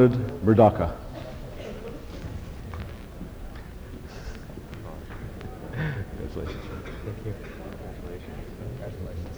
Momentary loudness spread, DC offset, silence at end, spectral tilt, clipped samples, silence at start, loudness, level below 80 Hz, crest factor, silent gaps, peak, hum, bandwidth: 19 LU; under 0.1%; 0 s; -8.5 dB/octave; under 0.1%; 0 s; -30 LUFS; -40 dBFS; 24 dB; none; -4 dBFS; none; over 20 kHz